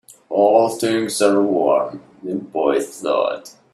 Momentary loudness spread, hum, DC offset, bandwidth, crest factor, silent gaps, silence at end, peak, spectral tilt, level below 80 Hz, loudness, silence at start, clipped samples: 13 LU; none; under 0.1%; 14.5 kHz; 18 dB; none; 0.25 s; 0 dBFS; -4.5 dB/octave; -64 dBFS; -18 LUFS; 0.3 s; under 0.1%